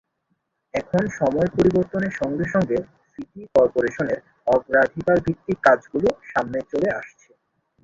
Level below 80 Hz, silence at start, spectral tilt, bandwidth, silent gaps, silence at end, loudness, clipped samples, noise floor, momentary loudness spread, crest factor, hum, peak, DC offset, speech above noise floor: -50 dBFS; 0.75 s; -7.5 dB/octave; 7.6 kHz; none; 0.75 s; -22 LUFS; under 0.1%; -73 dBFS; 12 LU; 18 dB; none; -4 dBFS; under 0.1%; 52 dB